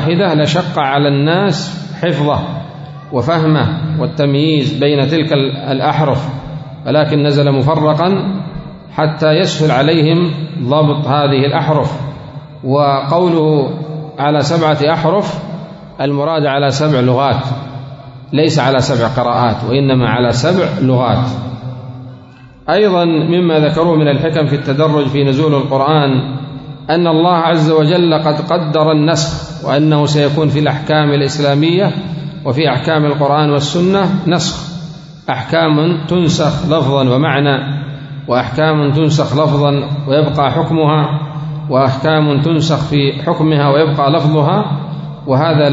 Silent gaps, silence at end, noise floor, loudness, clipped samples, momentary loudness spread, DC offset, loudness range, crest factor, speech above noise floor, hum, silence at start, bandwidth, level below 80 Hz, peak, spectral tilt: none; 0 s; -37 dBFS; -13 LUFS; under 0.1%; 12 LU; under 0.1%; 2 LU; 12 dB; 26 dB; none; 0 s; 7.8 kHz; -44 dBFS; 0 dBFS; -6.5 dB/octave